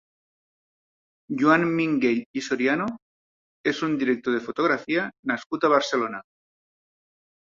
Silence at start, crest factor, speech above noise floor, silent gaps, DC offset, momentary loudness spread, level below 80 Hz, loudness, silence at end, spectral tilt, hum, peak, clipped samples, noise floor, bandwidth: 1.3 s; 22 dB; over 66 dB; 2.26-2.34 s, 3.02-3.64 s, 5.19-5.23 s, 5.46-5.50 s; under 0.1%; 9 LU; -68 dBFS; -24 LUFS; 1.35 s; -5.5 dB/octave; none; -4 dBFS; under 0.1%; under -90 dBFS; 7.6 kHz